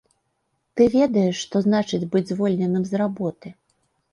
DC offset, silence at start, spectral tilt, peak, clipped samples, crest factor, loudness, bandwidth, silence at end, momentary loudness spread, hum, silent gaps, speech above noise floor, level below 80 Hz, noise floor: under 0.1%; 0.75 s; -6.5 dB/octave; -6 dBFS; under 0.1%; 18 dB; -21 LUFS; 10 kHz; 0.6 s; 11 LU; none; none; 52 dB; -58 dBFS; -73 dBFS